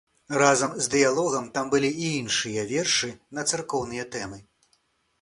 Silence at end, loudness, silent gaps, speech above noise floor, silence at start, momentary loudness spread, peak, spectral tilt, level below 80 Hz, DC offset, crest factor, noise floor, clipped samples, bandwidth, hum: 0.8 s; -25 LUFS; none; 44 dB; 0.3 s; 12 LU; -2 dBFS; -3 dB/octave; -60 dBFS; under 0.1%; 24 dB; -69 dBFS; under 0.1%; 11.5 kHz; none